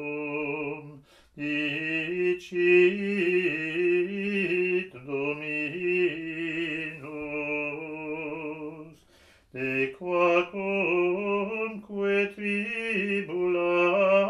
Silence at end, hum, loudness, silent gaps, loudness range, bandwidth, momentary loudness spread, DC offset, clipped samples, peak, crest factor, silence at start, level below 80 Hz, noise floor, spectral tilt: 0 s; none; -27 LUFS; none; 7 LU; 10.5 kHz; 12 LU; under 0.1%; under 0.1%; -8 dBFS; 18 dB; 0 s; -68 dBFS; -59 dBFS; -6.5 dB/octave